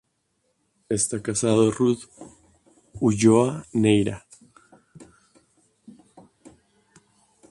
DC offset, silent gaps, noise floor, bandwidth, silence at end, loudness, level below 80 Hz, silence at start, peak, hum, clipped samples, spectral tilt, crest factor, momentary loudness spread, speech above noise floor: under 0.1%; none; -72 dBFS; 11.5 kHz; 2.5 s; -22 LUFS; -56 dBFS; 0.9 s; -4 dBFS; none; under 0.1%; -5.5 dB/octave; 20 dB; 12 LU; 51 dB